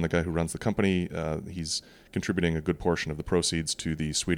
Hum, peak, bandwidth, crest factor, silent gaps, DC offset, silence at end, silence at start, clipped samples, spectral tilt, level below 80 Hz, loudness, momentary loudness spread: none; -12 dBFS; 16 kHz; 16 dB; none; under 0.1%; 0 s; 0 s; under 0.1%; -4.5 dB/octave; -46 dBFS; -29 LUFS; 7 LU